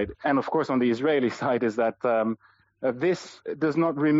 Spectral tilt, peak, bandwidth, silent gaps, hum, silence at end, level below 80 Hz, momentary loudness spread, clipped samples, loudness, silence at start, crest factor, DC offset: -5.5 dB/octave; -14 dBFS; 7.8 kHz; none; none; 0 s; -62 dBFS; 7 LU; under 0.1%; -26 LUFS; 0 s; 12 dB; under 0.1%